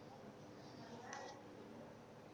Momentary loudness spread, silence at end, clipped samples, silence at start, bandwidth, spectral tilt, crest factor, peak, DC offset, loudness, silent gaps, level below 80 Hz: 6 LU; 0 s; under 0.1%; 0 s; 19.5 kHz; -4.5 dB/octave; 22 dB; -34 dBFS; under 0.1%; -55 LUFS; none; -82 dBFS